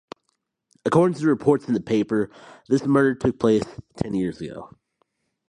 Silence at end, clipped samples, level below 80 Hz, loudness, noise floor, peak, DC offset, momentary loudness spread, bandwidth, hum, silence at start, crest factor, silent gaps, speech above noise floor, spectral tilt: 0.8 s; under 0.1%; -54 dBFS; -22 LUFS; -74 dBFS; -4 dBFS; under 0.1%; 13 LU; 11 kHz; none; 0.85 s; 18 dB; none; 53 dB; -7.5 dB/octave